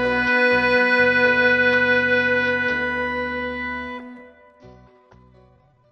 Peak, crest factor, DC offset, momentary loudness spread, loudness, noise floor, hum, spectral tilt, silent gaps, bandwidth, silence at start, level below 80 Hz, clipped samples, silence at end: -6 dBFS; 16 dB; under 0.1%; 11 LU; -18 LUFS; -55 dBFS; none; -5.5 dB/octave; none; 7.8 kHz; 0 s; -50 dBFS; under 0.1%; 1.2 s